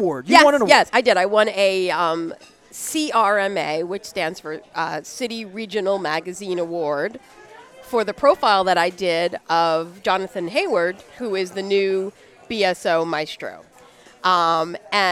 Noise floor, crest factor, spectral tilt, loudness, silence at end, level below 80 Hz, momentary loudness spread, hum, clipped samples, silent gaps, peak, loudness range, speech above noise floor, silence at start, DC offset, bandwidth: -48 dBFS; 20 dB; -3.5 dB/octave; -20 LUFS; 0 s; -62 dBFS; 13 LU; none; under 0.1%; none; 0 dBFS; 7 LU; 28 dB; 0 s; under 0.1%; 16 kHz